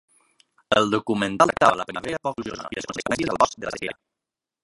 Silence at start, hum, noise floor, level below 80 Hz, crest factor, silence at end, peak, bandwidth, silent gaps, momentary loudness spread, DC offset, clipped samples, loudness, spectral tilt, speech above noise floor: 0.7 s; none; -87 dBFS; -56 dBFS; 24 dB; 0.7 s; -2 dBFS; 11.5 kHz; none; 13 LU; under 0.1%; under 0.1%; -23 LUFS; -4 dB/octave; 64 dB